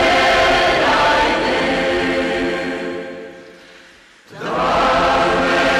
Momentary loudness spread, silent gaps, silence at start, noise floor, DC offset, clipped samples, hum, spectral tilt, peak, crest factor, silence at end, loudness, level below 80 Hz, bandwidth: 15 LU; none; 0 s; -45 dBFS; under 0.1%; under 0.1%; none; -4 dB/octave; -6 dBFS; 10 dB; 0 s; -15 LUFS; -38 dBFS; 15 kHz